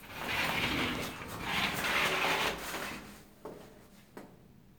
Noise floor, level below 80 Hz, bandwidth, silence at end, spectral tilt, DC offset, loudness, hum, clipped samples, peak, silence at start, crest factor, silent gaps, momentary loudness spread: -58 dBFS; -56 dBFS; over 20 kHz; 0.1 s; -3 dB/octave; under 0.1%; -32 LUFS; none; under 0.1%; -16 dBFS; 0 s; 20 dB; none; 23 LU